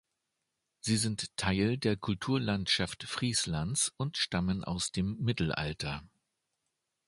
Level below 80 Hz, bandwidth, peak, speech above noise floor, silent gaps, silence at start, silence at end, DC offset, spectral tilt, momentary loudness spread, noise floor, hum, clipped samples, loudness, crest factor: -52 dBFS; 11.5 kHz; -14 dBFS; 52 dB; none; 0.85 s; 1 s; under 0.1%; -4 dB/octave; 5 LU; -84 dBFS; none; under 0.1%; -32 LUFS; 20 dB